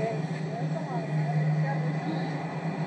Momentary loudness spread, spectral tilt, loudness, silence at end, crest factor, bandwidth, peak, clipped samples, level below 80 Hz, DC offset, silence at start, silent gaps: 5 LU; -8 dB/octave; -30 LUFS; 0 s; 12 dB; 8.4 kHz; -18 dBFS; under 0.1%; -78 dBFS; under 0.1%; 0 s; none